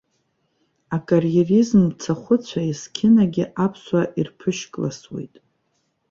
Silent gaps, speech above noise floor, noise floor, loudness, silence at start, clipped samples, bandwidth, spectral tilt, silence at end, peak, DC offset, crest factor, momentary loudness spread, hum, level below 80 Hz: none; 50 dB; -70 dBFS; -20 LUFS; 0.9 s; under 0.1%; 7.6 kHz; -7 dB/octave; 0.85 s; -4 dBFS; under 0.1%; 16 dB; 13 LU; none; -58 dBFS